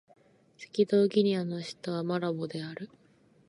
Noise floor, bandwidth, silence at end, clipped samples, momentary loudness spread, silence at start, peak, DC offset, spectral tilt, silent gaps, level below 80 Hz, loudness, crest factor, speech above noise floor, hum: -63 dBFS; 11 kHz; 0.65 s; under 0.1%; 18 LU; 0.6 s; -14 dBFS; under 0.1%; -7 dB/octave; none; -80 dBFS; -30 LUFS; 18 dB; 34 dB; none